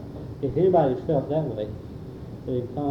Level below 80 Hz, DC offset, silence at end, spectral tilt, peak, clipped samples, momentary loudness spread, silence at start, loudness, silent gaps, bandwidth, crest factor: -48 dBFS; under 0.1%; 0 s; -10 dB/octave; -8 dBFS; under 0.1%; 18 LU; 0 s; -25 LUFS; none; 6 kHz; 16 dB